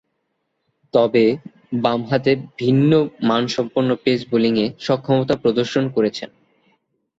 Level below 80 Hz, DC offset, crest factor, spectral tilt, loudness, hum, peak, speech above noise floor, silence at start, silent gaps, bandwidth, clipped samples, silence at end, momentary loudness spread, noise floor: -58 dBFS; under 0.1%; 16 dB; -7 dB/octave; -19 LUFS; none; -4 dBFS; 54 dB; 0.95 s; none; 7.8 kHz; under 0.1%; 0.95 s; 6 LU; -72 dBFS